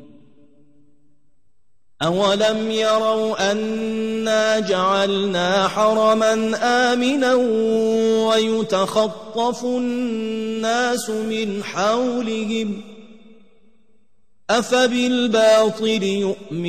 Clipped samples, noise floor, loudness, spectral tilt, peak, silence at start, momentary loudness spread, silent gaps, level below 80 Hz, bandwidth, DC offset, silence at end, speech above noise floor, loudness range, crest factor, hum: under 0.1%; -65 dBFS; -19 LUFS; -4 dB/octave; -4 dBFS; 2 s; 7 LU; none; -60 dBFS; 13.5 kHz; 0.4%; 0 s; 46 dB; 5 LU; 16 dB; none